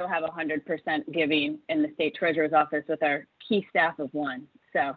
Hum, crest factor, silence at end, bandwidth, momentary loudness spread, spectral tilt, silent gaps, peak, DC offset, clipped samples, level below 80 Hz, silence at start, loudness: none; 18 dB; 0 s; 4.8 kHz; 8 LU; -8 dB/octave; none; -10 dBFS; under 0.1%; under 0.1%; -72 dBFS; 0 s; -27 LUFS